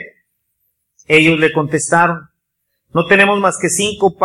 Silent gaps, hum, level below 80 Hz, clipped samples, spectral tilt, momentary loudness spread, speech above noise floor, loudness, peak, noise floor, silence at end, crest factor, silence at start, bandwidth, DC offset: none; none; -52 dBFS; under 0.1%; -4 dB/octave; 8 LU; 59 dB; -13 LUFS; 0 dBFS; -72 dBFS; 0 s; 16 dB; 0 s; 13.5 kHz; under 0.1%